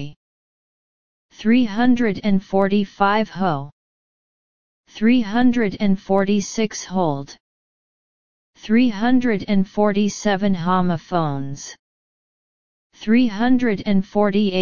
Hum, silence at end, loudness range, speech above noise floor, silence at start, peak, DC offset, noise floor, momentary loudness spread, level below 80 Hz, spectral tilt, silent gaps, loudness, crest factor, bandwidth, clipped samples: none; 0 s; 3 LU; over 72 dB; 0 s; -2 dBFS; 2%; under -90 dBFS; 10 LU; -48 dBFS; -6 dB/octave; 0.16-1.29 s, 3.72-4.84 s, 7.40-8.54 s, 11.79-12.90 s; -19 LUFS; 18 dB; 7.2 kHz; under 0.1%